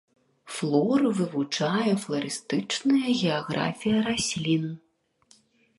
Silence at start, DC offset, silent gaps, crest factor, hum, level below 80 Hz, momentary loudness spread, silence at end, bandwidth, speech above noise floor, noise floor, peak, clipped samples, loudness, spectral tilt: 0.45 s; under 0.1%; none; 18 dB; none; -62 dBFS; 7 LU; 1 s; 11.5 kHz; 37 dB; -63 dBFS; -10 dBFS; under 0.1%; -26 LUFS; -5 dB/octave